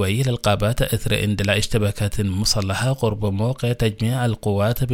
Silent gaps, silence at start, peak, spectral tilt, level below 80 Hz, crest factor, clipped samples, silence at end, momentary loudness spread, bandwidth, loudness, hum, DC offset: none; 0 s; -2 dBFS; -5 dB/octave; -34 dBFS; 18 dB; under 0.1%; 0 s; 3 LU; 16.5 kHz; -21 LUFS; none; under 0.1%